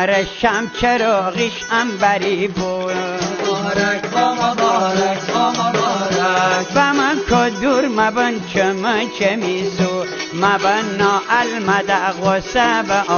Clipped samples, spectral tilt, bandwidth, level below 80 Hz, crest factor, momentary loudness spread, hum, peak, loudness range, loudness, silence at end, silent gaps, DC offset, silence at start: under 0.1%; -4 dB/octave; 7 kHz; -44 dBFS; 16 dB; 5 LU; none; 0 dBFS; 2 LU; -17 LUFS; 0 s; none; under 0.1%; 0 s